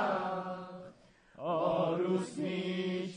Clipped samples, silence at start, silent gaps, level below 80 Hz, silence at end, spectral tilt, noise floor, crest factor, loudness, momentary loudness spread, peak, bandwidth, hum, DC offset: under 0.1%; 0 s; none; -74 dBFS; 0 s; -6.5 dB/octave; -60 dBFS; 14 dB; -34 LUFS; 15 LU; -20 dBFS; 10 kHz; none; under 0.1%